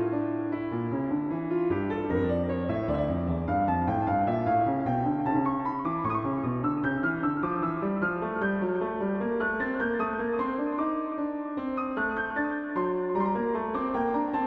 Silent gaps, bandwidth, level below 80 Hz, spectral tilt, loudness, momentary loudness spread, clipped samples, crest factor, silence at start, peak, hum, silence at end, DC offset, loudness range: none; 5 kHz; -50 dBFS; -10 dB/octave; -29 LUFS; 4 LU; under 0.1%; 14 dB; 0 s; -14 dBFS; none; 0 s; under 0.1%; 2 LU